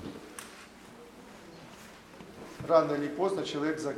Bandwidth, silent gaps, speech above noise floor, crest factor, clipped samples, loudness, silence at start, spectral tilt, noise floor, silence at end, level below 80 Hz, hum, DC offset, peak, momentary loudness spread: 16 kHz; none; 22 dB; 24 dB; under 0.1%; -30 LUFS; 0 s; -5 dB/octave; -51 dBFS; 0 s; -66 dBFS; none; under 0.1%; -10 dBFS; 24 LU